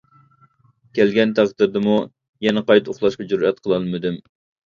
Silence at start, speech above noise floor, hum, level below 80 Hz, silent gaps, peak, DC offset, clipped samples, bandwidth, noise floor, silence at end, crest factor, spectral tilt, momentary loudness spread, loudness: 0.95 s; 39 dB; none; -58 dBFS; 2.29-2.33 s; 0 dBFS; under 0.1%; under 0.1%; 7.4 kHz; -57 dBFS; 0.5 s; 20 dB; -6.5 dB/octave; 10 LU; -19 LUFS